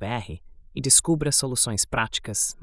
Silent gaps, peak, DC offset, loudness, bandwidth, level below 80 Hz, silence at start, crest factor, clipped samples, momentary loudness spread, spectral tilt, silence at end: none; -4 dBFS; under 0.1%; -21 LUFS; 12 kHz; -46 dBFS; 0 s; 20 dB; under 0.1%; 15 LU; -2.5 dB/octave; 0 s